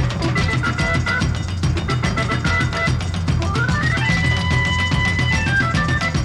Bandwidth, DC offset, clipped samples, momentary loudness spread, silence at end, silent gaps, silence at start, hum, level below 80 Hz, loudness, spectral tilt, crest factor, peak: 11.5 kHz; 0.4%; under 0.1%; 4 LU; 0 s; none; 0 s; none; -30 dBFS; -19 LUFS; -5 dB/octave; 12 dB; -6 dBFS